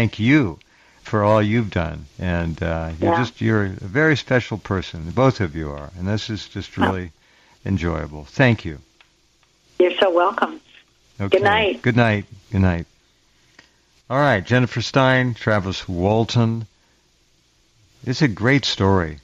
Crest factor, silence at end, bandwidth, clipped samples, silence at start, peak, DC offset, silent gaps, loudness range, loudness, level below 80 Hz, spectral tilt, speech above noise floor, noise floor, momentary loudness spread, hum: 16 dB; 0.05 s; 7.8 kHz; under 0.1%; 0 s; -4 dBFS; under 0.1%; none; 4 LU; -20 LUFS; -46 dBFS; -6.5 dB/octave; 41 dB; -60 dBFS; 12 LU; none